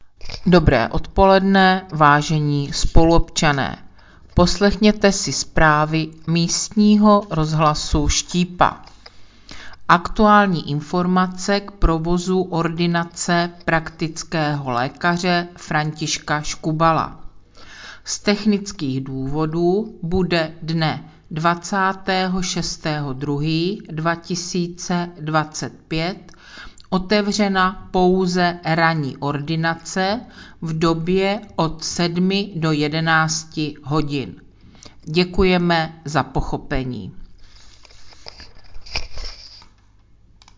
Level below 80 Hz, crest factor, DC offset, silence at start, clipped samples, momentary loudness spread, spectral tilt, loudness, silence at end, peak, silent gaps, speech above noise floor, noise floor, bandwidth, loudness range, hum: -32 dBFS; 20 dB; under 0.1%; 0 s; under 0.1%; 12 LU; -5 dB/octave; -19 LUFS; 1 s; 0 dBFS; none; 32 dB; -51 dBFS; 7.6 kHz; 6 LU; none